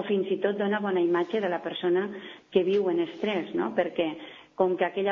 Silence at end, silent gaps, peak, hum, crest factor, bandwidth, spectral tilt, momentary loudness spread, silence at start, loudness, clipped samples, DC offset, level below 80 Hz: 0 s; none; -10 dBFS; none; 18 dB; 6.4 kHz; -7.5 dB/octave; 6 LU; 0 s; -27 LUFS; under 0.1%; under 0.1%; -72 dBFS